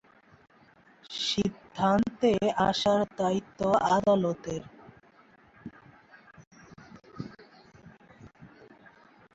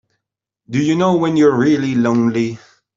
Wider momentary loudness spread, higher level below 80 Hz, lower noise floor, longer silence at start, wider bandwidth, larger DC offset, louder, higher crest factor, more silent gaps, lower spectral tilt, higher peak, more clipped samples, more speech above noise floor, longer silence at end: first, 24 LU vs 10 LU; about the same, -60 dBFS vs -58 dBFS; second, -59 dBFS vs -80 dBFS; first, 1.1 s vs 0.7 s; about the same, 8 kHz vs 7.6 kHz; neither; second, -27 LUFS vs -15 LUFS; first, 20 dB vs 14 dB; first, 6.47-6.51 s vs none; second, -5.5 dB/octave vs -7 dB/octave; second, -12 dBFS vs -2 dBFS; neither; second, 33 dB vs 66 dB; first, 0.9 s vs 0.4 s